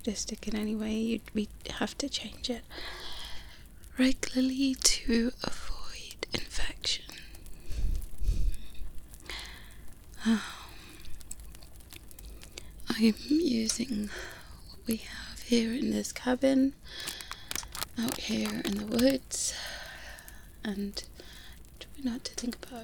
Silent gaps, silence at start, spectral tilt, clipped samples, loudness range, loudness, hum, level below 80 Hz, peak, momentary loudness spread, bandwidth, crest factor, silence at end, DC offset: none; 0 s; -3.5 dB/octave; under 0.1%; 8 LU; -32 LUFS; none; -42 dBFS; -6 dBFS; 21 LU; over 20 kHz; 26 dB; 0 s; 0.1%